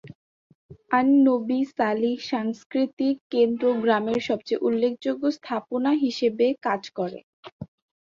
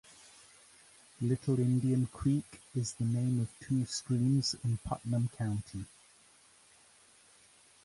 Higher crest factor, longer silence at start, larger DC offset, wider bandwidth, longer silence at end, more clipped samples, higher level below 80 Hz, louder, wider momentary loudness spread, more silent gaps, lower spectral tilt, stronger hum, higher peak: about the same, 18 dB vs 16 dB; second, 0.05 s vs 1.2 s; neither; second, 7.2 kHz vs 11.5 kHz; second, 0.45 s vs 2 s; neither; second, -68 dBFS vs -58 dBFS; first, -24 LUFS vs -33 LUFS; second, 11 LU vs 14 LU; first, 0.15-0.69 s, 2.66-2.70 s, 2.93-2.97 s, 3.21-3.30 s, 7.23-7.43 s, 7.52-7.59 s vs none; about the same, -6 dB/octave vs -6.5 dB/octave; neither; first, -8 dBFS vs -20 dBFS